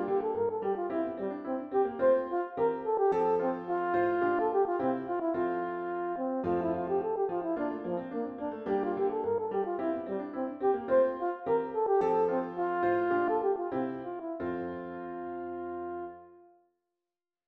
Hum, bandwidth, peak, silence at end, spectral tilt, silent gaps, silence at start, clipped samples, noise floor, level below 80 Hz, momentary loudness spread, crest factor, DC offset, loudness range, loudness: none; 4.9 kHz; -16 dBFS; 1.05 s; -9 dB/octave; none; 0 s; under 0.1%; under -90 dBFS; -68 dBFS; 11 LU; 16 dB; under 0.1%; 4 LU; -31 LUFS